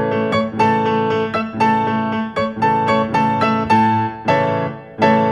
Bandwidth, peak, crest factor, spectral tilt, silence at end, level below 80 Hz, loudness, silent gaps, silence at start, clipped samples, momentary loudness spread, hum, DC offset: 10 kHz; -2 dBFS; 14 dB; -7 dB/octave; 0 s; -50 dBFS; -17 LUFS; none; 0 s; under 0.1%; 6 LU; none; under 0.1%